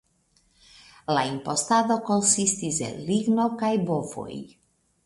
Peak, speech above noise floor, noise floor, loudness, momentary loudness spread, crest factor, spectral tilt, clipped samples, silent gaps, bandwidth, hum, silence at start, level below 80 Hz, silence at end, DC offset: -6 dBFS; 41 dB; -66 dBFS; -24 LUFS; 15 LU; 20 dB; -4 dB/octave; under 0.1%; none; 11.5 kHz; none; 1.1 s; -62 dBFS; 0.6 s; under 0.1%